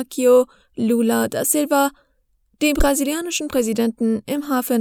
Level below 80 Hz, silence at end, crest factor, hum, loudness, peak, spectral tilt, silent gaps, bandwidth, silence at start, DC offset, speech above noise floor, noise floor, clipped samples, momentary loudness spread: -34 dBFS; 0 s; 16 dB; none; -19 LUFS; -4 dBFS; -3.5 dB/octave; none; over 20 kHz; 0 s; under 0.1%; 45 dB; -64 dBFS; under 0.1%; 8 LU